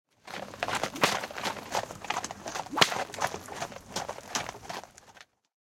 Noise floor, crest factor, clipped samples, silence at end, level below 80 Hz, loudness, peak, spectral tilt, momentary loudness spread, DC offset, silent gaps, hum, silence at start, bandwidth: -56 dBFS; 34 dB; under 0.1%; 0.45 s; -64 dBFS; -32 LUFS; 0 dBFS; -2 dB/octave; 16 LU; under 0.1%; none; none; 0.25 s; 17 kHz